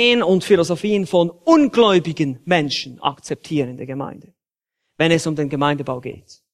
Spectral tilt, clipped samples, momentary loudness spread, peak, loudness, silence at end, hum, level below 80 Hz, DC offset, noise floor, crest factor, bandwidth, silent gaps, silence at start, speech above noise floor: -5.5 dB/octave; under 0.1%; 14 LU; 0 dBFS; -18 LUFS; 0.35 s; none; -58 dBFS; under 0.1%; -81 dBFS; 18 dB; 13 kHz; none; 0 s; 63 dB